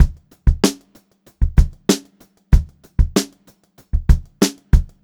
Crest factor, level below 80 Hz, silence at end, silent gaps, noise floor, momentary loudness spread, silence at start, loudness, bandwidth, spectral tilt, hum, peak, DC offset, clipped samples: 18 dB; -20 dBFS; 0.2 s; none; -53 dBFS; 8 LU; 0 s; -20 LUFS; 17 kHz; -5.5 dB/octave; none; 0 dBFS; under 0.1%; under 0.1%